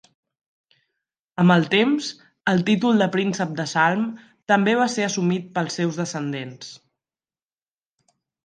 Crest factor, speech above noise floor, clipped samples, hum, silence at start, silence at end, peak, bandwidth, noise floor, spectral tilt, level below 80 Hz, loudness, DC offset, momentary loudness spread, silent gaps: 20 dB; over 69 dB; under 0.1%; none; 1.4 s; 1.7 s; -2 dBFS; 9.6 kHz; under -90 dBFS; -5.5 dB/octave; -70 dBFS; -21 LUFS; under 0.1%; 14 LU; none